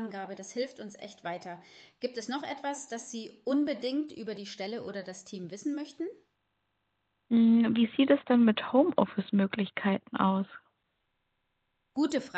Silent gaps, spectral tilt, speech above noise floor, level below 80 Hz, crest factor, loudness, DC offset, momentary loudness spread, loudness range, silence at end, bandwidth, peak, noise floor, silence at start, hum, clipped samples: none; -6 dB/octave; 49 dB; -78 dBFS; 20 dB; -30 LUFS; under 0.1%; 17 LU; 12 LU; 0 s; 8.8 kHz; -10 dBFS; -79 dBFS; 0 s; 50 Hz at -60 dBFS; under 0.1%